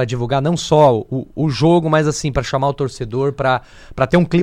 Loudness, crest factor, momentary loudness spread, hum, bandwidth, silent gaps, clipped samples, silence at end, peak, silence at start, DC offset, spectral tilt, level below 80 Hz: -17 LUFS; 14 dB; 9 LU; none; 11 kHz; none; under 0.1%; 0 s; -2 dBFS; 0 s; under 0.1%; -6.5 dB/octave; -38 dBFS